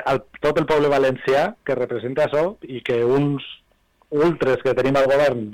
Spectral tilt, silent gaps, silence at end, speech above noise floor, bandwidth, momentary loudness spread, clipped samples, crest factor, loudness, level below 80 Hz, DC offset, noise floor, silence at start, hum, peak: -6.5 dB/octave; none; 0 s; 36 dB; 15.5 kHz; 8 LU; under 0.1%; 8 dB; -20 LUFS; -50 dBFS; 0.1%; -56 dBFS; 0 s; none; -12 dBFS